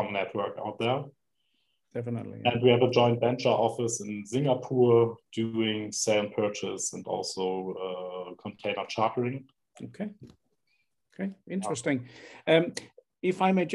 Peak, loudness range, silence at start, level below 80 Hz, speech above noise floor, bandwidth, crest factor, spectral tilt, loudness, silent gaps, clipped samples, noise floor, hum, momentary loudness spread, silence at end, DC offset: -8 dBFS; 9 LU; 0 s; -74 dBFS; 49 dB; 12 kHz; 20 dB; -5 dB/octave; -28 LUFS; none; under 0.1%; -77 dBFS; none; 16 LU; 0 s; under 0.1%